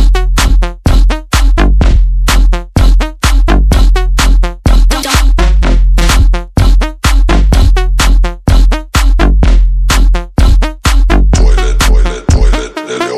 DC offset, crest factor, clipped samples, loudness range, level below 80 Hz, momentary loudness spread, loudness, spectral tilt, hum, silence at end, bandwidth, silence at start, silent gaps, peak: under 0.1%; 6 dB; 2%; 1 LU; -8 dBFS; 3 LU; -11 LUFS; -5 dB/octave; none; 0 s; 14 kHz; 0 s; none; 0 dBFS